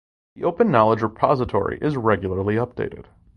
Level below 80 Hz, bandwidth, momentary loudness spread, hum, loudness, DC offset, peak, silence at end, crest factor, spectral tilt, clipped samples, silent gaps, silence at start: -44 dBFS; 9.4 kHz; 10 LU; none; -21 LUFS; under 0.1%; -2 dBFS; 0.35 s; 20 dB; -9 dB/octave; under 0.1%; none; 0.35 s